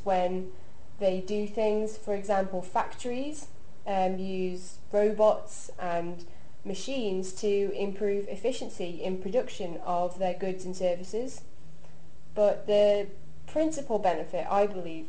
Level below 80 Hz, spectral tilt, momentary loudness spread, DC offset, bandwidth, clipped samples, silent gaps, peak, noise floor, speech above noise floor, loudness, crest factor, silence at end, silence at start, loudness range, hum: -58 dBFS; -5.5 dB/octave; 13 LU; 3%; 9.8 kHz; under 0.1%; none; -12 dBFS; -54 dBFS; 25 dB; -30 LUFS; 18 dB; 0 s; 0.05 s; 3 LU; none